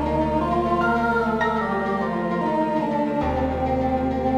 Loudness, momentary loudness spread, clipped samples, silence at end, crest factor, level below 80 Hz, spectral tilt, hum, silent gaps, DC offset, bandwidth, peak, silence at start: -22 LUFS; 3 LU; under 0.1%; 0 s; 12 dB; -38 dBFS; -8 dB/octave; none; none; under 0.1%; 10.5 kHz; -10 dBFS; 0 s